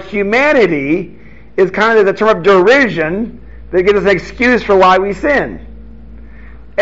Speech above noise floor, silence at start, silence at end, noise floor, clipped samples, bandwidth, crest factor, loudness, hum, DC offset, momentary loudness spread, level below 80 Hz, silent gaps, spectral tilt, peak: 24 dB; 0 s; 0 s; -35 dBFS; under 0.1%; 7.8 kHz; 12 dB; -11 LUFS; none; 2%; 13 LU; -36 dBFS; none; -3.5 dB/octave; 0 dBFS